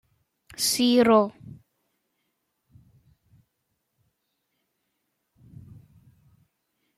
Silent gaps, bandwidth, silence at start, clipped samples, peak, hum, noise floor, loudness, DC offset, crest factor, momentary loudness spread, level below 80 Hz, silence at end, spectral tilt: none; 15 kHz; 0.6 s; under 0.1%; -6 dBFS; none; -78 dBFS; -21 LUFS; under 0.1%; 24 dB; 13 LU; -68 dBFS; 5.65 s; -3.5 dB/octave